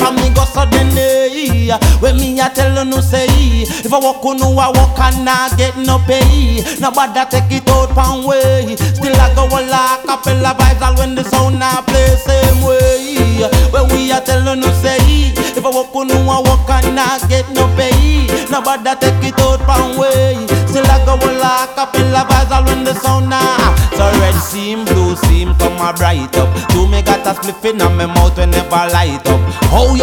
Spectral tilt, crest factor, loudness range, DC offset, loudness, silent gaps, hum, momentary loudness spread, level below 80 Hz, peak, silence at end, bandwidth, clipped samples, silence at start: -5 dB/octave; 10 dB; 1 LU; under 0.1%; -12 LUFS; none; none; 4 LU; -16 dBFS; 0 dBFS; 0 s; 20 kHz; under 0.1%; 0 s